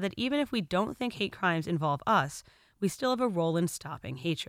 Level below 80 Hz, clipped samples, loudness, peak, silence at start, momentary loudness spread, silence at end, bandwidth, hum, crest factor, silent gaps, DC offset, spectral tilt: -62 dBFS; under 0.1%; -30 LUFS; -14 dBFS; 0 s; 8 LU; 0.05 s; 16 kHz; none; 18 dB; none; under 0.1%; -5 dB/octave